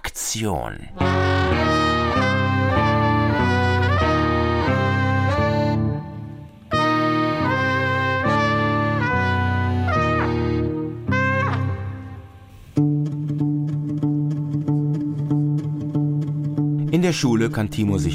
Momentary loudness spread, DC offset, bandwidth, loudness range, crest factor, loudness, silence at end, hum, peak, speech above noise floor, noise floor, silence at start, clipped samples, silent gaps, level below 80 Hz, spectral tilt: 6 LU; under 0.1%; 15.5 kHz; 4 LU; 14 dB; -21 LUFS; 0 s; none; -6 dBFS; 22 dB; -43 dBFS; 0.05 s; under 0.1%; none; -38 dBFS; -6 dB/octave